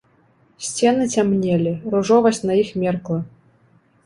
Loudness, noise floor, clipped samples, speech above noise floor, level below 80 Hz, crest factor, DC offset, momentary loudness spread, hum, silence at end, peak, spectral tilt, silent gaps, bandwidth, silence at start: -19 LUFS; -57 dBFS; under 0.1%; 39 dB; -56 dBFS; 18 dB; under 0.1%; 11 LU; none; 0.8 s; -2 dBFS; -5.5 dB/octave; none; 11.5 kHz; 0.6 s